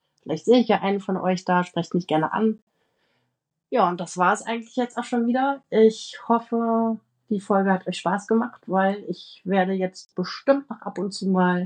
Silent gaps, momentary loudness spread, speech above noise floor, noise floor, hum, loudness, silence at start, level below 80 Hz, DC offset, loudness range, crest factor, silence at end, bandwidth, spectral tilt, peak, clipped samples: 2.62-2.67 s; 11 LU; 54 dB; -77 dBFS; none; -23 LUFS; 0.25 s; -80 dBFS; under 0.1%; 2 LU; 18 dB; 0 s; 10 kHz; -6 dB/octave; -6 dBFS; under 0.1%